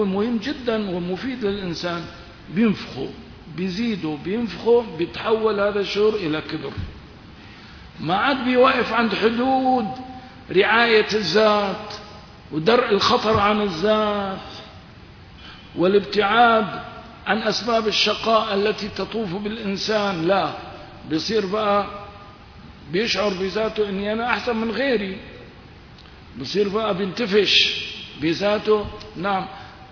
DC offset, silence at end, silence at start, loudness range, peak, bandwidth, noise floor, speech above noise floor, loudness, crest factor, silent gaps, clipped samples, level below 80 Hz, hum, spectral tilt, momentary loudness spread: under 0.1%; 0.05 s; 0 s; 6 LU; -2 dBFS; 5.4 kHz; -44 dBFS; 23 dB; -21 LUFS; 18 dB; none; under 0.1%; -48 dBFS; none; -5 dB/octave; 19 LU